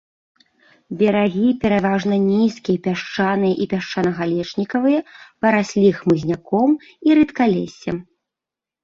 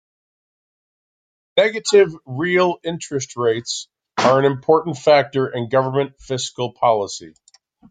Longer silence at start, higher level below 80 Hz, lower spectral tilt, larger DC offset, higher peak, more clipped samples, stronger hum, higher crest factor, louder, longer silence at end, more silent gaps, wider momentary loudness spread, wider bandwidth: second, 0.9 s vs 1.55 s; first, -54 dBFS vs -60 dBFS; first, -7 dB/octave vs -4.5 dB/octave; neither; about the same, -2 dBFS vs -2 dBFS; neither; neither; about the same, 16 dB vs 18 dB; about the same, -19 LUFS vs -19 LUFS; first, 0.8 s vs 0.6 s; neither; second, 7 LU vs 11 LU; second, 7.4 kHz vs 9.4 kHz